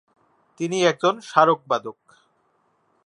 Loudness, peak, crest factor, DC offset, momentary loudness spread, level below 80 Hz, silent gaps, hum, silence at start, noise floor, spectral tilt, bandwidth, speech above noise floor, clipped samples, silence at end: -21 LUFS; 0 dBFS; 22 dB; under 0.1%; 11 LU; -76 dBFS; none; none; 0.6 s; -66 dBFS; -4.5 dB/octave; 11 kHz; 46 dB; under 0.1%; 1.15 s